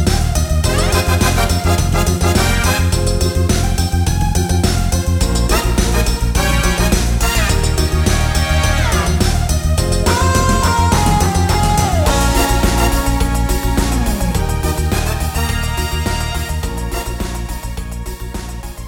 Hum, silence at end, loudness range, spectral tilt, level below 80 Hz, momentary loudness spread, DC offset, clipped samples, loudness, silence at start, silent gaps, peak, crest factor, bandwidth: none; 0 s; 5 LU; -4.5 dB/octave; -18 dBFS; 8 LU; under 0.1%; under 0.1%; -15 LUFS; 0 s; none; 0 dBFS; 14 dB; 17.5 kHz